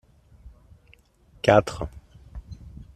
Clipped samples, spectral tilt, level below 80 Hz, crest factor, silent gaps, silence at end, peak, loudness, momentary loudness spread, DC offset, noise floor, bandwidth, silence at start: under 0.1%; -6 dB/octave; -46 dBFS; 24 dB; none; 0.15 s; -4 dBFS; -23 LUFS; 25 LU; under 0.1%; -57 dBFS; 13 kHz; 1.45 s